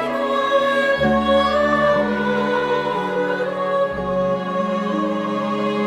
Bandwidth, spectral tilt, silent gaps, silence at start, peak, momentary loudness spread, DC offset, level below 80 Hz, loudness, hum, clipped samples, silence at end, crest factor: 11.5 kHz; -6 dB/octave; none; 0 s; -6 dBFS; 5 LU; under 0.1%; -44 dBFS; -19 LUFS; none; under 0.1%; 0 s; 14 dB